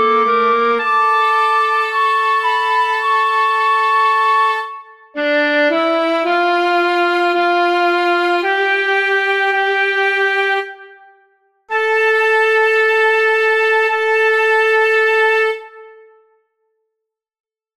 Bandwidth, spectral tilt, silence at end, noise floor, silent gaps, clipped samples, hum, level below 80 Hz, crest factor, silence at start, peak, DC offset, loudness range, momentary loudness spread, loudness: 14 kHz; -2 dB/octave; 1.85 s; -79 dBFS; none; under 0.1%; none; -74 dBFS; 12 dB; 0 s; -4 dBFS; under 0.1%; 3 LU; 4 LU; -14 LUFS